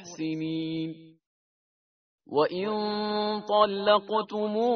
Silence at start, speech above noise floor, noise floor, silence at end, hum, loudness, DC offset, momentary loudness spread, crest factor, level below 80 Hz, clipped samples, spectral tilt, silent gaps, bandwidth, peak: 0 s; over 63 dB; under -90 dBFS; 0 s; none; -27 LUFS; under 0.1%; 10 LU; 20 dB; -72 dBFS; under 0.1%; -3.5 dB/octave; 1.26-2.18 s; 6.6 kHz; -8 dBFS